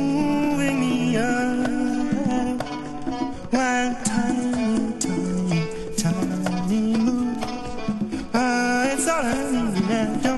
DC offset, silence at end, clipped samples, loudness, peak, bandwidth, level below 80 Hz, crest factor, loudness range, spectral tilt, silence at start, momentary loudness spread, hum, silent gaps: under 0.1%; 0 s; under 0.1%; -23 LUFS; -6 dBFS; 12 kHz; -44 dBFS; 16 dB; 1 LU; -5 dB/octave; 0 s; 7 LU; none; none